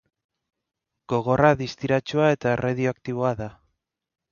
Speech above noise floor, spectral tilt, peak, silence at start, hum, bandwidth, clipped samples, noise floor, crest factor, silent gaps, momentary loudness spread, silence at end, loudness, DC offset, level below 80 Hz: 55 dB; -7 dB/octave; -4 dBFS; 1.1 s; none; 7.2 kHz; under 0.1%; -77 dBFS; 20 dB; none; 8 LU; 0.8 s; -23 LUFS; under 0.1%; -54 dBFS